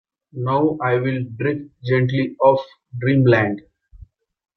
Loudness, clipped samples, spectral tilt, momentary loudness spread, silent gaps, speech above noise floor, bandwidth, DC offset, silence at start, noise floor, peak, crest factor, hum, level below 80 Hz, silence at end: -19 LUFS; under 0.1%; -9.5 dB/octave; 12 LU; none; 28 dB; 6 kHz; under 0.1%; 0.35 s; -47 dBFS; -2 dBFS; 18 dB; none; -54 dBFS; 0.5 s